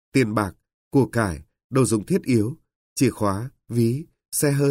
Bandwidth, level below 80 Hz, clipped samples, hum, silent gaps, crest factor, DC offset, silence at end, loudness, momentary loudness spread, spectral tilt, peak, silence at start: 16 kHz; -50 dBFS; under 0.1%; none; 0.74-0.91 s, 1.64-1.70 s, 2.75-2.96 s; 16 dB; under 0.1%; 0 s; -23 LUFS; 10 LU; -6 dB/octave; -8 dBFS; 0.15 s